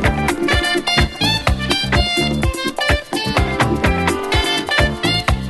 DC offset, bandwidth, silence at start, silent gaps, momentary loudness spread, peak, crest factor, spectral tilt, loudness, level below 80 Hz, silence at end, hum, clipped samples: under 0.1%; 12.5 kHz; 0 s; none; 3 LU; 0 dBFS; 16 dB; -4.5 dB/octave; -17 LUFS; -24 dBFS; 0 s; none; under 0.1%